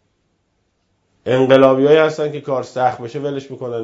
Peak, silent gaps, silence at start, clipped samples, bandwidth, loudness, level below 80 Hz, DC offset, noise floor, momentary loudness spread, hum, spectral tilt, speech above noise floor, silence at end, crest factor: 0 dBFS; none; 1.25 s; under 0.1%; 7.8 kHz; -16 LUFS; -60 dBFS; under 0.1%; -66 dBFS; 15 LU; none; -6.5 dB/octave; 51 dB; 0 s; 16 dB